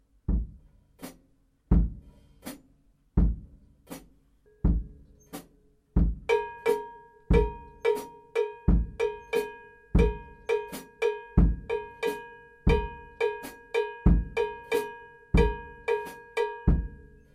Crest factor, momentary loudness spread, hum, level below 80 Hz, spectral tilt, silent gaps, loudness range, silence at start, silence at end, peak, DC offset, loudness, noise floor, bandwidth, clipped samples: 20 dB; 20 LU; none; -32 dBFS; -7.5 dB/octave; none; 5 LU; 0.3 s; 0.4 s; -8 dBFS; under 0.1%; -29 LUFS; -65 dBFS; 15.5 kHz; under 0.1%